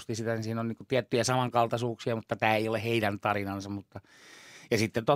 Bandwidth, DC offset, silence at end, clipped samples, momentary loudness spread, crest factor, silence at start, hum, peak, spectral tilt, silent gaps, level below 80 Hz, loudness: 16 kHz; under 0.1%; 0 s; under 0.1%; 13 LU; 22 dB; 0 s; none; -8 dBFS; -5 dB/octave; none; -70 dBFS; -30 LUFS